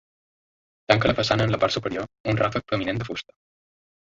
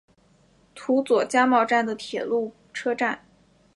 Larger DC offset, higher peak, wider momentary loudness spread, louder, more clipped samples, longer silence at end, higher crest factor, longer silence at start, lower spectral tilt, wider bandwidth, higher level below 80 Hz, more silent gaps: neither; about the same, -4 dBFS vs -6 dBFS; about the same, 10 LU vs 12 LU; about the same, -24 LUFS vs -23 LUFS; neither; first, 0.85 s vs 0.6 s; about the same, 22 dB vs 18 dB; first, 0.9 s vs 0.75 s; first, -5.5 dB/octave vs -4 dB/octave; second, 7.8 kHz vs 11.5 kHz; first, -48 dBFS vs -68 dBFS; first, 2.20-2.24 s vs none